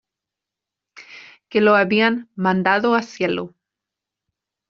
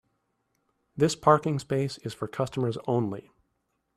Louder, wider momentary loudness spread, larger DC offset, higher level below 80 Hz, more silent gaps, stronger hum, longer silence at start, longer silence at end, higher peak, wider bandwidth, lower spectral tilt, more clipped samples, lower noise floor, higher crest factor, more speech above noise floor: first, -18 LUFS vs -27 LUFS; about the same, 11 LU vs 13 LU; neither; about the same, -66 dBFS vs -64 dBFS; neither; neither; about the same, 0.95 s vs 0.95 s; first, 1.2 s vs 0.75 s; first, -2 dBFS vs -6 dBFS; second, 7.2 kHz vs 13.5 kHz; second, -3.5 dB/octave vs -6 dB/octave; neither; first, -86 dBFS vs -77 dBFS; second, 18 dB vs 24 dB; first, 68 dB vs 50 dB